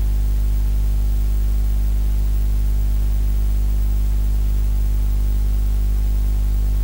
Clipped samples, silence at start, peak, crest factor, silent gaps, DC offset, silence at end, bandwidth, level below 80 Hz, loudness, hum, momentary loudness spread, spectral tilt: under 0.1%; 0 s; -10 dBFS; 6 dB; none; under 0.1%; 0 s; 16 kHz; -18 dBFS; -22 LUFS; 50 Hz at -15 dBFS; 0 LU; -6.5 dB/octave